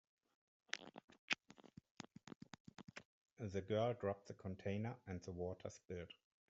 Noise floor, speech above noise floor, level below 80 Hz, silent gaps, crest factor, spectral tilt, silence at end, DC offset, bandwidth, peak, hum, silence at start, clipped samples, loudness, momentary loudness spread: -65 dBFS; 19 dB; -80 dBFS; 1.04-1.08 s, 1.19-1.28 s, 1.91-1.95 s, 2.36-2.40 s, 2.60-2.65 s, 3.05-3.25 s, 3.32-3.36 s; 30 dB; -4.5 dB/octave; 0.35 s; under 0.1%; 8 kHz; -18 dBFS; none; 0.75 s; under 0.1%; -47 LUFS; 19 LU